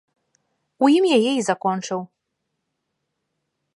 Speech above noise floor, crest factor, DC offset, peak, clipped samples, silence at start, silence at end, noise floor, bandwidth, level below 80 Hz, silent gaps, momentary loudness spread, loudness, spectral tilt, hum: 59 dB; 20 dB; under 0.1%; -4 dBFS; under 0.1%; 0.8 s; 1.75 s; -78 dBFS; 11.5 kHz; -78 dBFS; none; 12 LU; -20 LUFS; -4.5 dB/octave; none